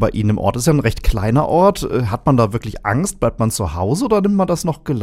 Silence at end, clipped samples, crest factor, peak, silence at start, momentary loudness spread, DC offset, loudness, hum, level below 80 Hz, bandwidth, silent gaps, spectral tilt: 0 s; under 0.1%; 16 dB; 0 dBFS; 0 s; 6 LU; under 0.1%; -17 LUFS; none; -28 dBFS; 16 kHz; none; -6.5 dB/octave